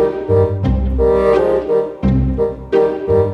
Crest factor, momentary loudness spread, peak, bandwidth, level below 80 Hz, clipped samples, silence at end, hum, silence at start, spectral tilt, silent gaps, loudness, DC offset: 12 dB; 5 LU; -2 dBFS; 6 kHz; -24 dBFS; under 0.1%; 0 s; none; 0 s; -9.5 dB/octave; none; -15 LUFS; under 0.1%